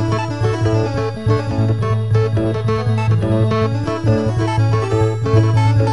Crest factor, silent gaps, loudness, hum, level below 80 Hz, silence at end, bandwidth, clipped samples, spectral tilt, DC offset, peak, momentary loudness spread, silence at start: 12 dB; none; -17 LUFS; none; -36 dBFS; 0 s; 10 kHz; under 0.1%; -8 dB/octave; 1%; -2 dBFS; 4 LU; 0 s